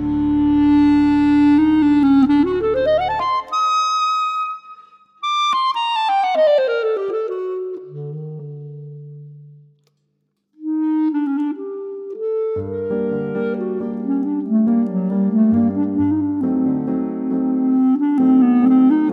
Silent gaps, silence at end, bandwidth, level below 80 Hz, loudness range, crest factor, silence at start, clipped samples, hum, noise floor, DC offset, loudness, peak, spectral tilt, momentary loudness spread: none; 0 s; 8 kHz; -46 dBFS; 10 LU; 12 dB; 0 s; under 0.1%; none; -70 dBFS; under 0.1%; -17 LUFS; -6 dBFS; -6.5 dB/octave; 16 LU